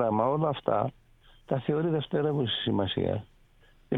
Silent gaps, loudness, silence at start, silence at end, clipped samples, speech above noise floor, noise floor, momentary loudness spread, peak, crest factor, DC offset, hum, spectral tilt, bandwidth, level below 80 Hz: none; -29 LUFS; 0 s; 0 s; under 0.1%; 31 dB; -59 dBFS; 6 LU; -12 dBFS; 18 dB; under 0.1%; none; -9 dB/octave; 4.1 kHz; -58 dBFS